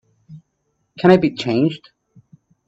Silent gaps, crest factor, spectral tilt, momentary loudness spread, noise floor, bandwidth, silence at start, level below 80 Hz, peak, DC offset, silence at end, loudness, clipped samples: none; 20 dB; -7.5 dB/octave; 8 LU; -70 dBFS; 7.8 kHz; 0.3 s; -56 dBFS; 0 dBFS; under 0.1%; 0.9 s; -17 LUFS; under 0.1%